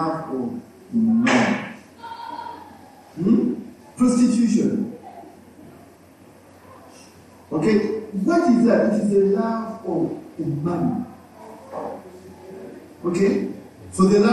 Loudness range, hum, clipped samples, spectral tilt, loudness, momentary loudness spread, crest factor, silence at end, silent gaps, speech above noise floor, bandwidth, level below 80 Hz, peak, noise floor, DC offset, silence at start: 8 LU; none; under 0.1%; -6.5 dB/octave; -21 LUFS; 23 LU; 16 dB; 0 s; none; 30 dB; 12 kHz; -58 dBFS; -6 dBFS; -48 dBFS; under 0.1%; 0 s